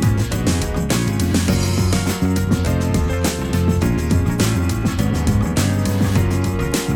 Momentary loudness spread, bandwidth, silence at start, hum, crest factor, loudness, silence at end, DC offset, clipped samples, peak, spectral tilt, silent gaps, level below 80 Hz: 2 LU; 18 kHz; 0 s; none; 14 dB; -18 LUFS; 0 s; under 0.1%; under 0.1%; -4 dBFS; -5.5 dB/octave; none; -28 dBFS